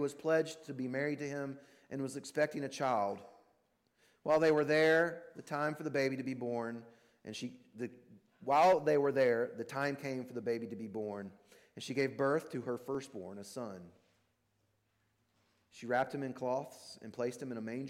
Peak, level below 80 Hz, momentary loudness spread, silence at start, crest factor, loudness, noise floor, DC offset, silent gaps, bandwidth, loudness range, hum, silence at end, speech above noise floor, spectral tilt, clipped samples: -20 dBFS; -80 dBFS; 18 LU; 0 s; 16 dB; -35 LUFS; -78 dBFS; under 0.1%; none; 15.5 kHz; 9 LU; none; 0 s; 43 dB; -5.5 dB/octave; under 0.1%